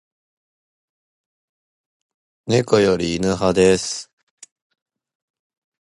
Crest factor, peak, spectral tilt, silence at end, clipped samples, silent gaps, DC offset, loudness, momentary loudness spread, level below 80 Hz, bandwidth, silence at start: 20 dB; -2 dBFS; -5 dB/octave; 1.85 s; under 0.1%; none; under 0.1%; -18 LUFS; 12 LU; -48 dBFS; 11.5 kHz; 2.45 s